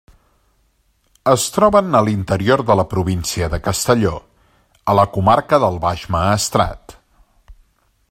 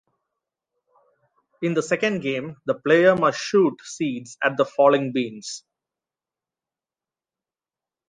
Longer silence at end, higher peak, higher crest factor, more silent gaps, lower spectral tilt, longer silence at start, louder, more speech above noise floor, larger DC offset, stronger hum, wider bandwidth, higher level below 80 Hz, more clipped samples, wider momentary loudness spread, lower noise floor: second, 0.6 s vs 2.5 s; first, 0 dBFS vs -4 dBFS; about the same, 18 dB vs 20 dB; neither; about the same, -5 dB/octave vs -5 dB/octave; second, 1.25 s vs 1.6 s; first, -16 LUFS vs -22 LUFS; second, 45 dB vs over 69 dB; neither; neither; first, 16.5 kHz vs 9.8 kHz; first, -40 dBFS vs -70 dBFS; neither; second, 8 LU vs 12 LU; second, -61 dBFS vs under -90 dBFS